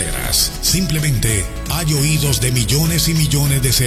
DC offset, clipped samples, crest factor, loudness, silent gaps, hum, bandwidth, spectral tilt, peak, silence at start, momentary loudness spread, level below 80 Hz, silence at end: under 0.1%; under 0.1%; 16 dB; -16 LUFS; none; none; 15.5 kHz; -3.5 dB/octave; 0 dBFS; 0 s; 3 LU; -26 dBFS; 0 s